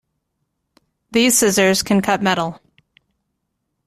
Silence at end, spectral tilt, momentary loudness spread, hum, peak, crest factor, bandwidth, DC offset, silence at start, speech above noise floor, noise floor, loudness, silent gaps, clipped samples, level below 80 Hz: 1.3 s; -3 dB/octave; 9 LU; none; -2 dBFS; 18 dB; 15.5 kHz; under 0.1%; 1.1 s; 58 dB; -74 dBFS; -16 LUFS; none; under 0.1%; -54 dBFS